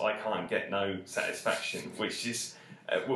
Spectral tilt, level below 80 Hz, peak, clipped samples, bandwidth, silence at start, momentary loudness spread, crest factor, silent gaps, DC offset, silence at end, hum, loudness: -3 dB/octave; -70 dBFS; -14 dBFS; under 0.1%; 13 kHz; 0 s; 5 LU; 20 dB; none; under 0.1%; 0 s; none; -33 LUFS